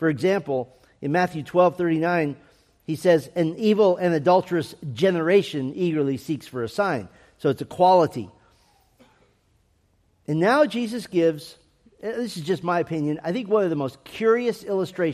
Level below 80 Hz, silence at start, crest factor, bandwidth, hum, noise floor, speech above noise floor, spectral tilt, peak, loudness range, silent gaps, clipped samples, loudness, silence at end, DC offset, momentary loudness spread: -64 dBFS; 0 s; 18 dB; 14.5 kHz; none; -64 dBFS; 42 dB; -6.5 dB/octave; -6 dBFS; 4 LU; none; under 0.1%; -23 LUFS; 0 s; under 0.1%; 13 LU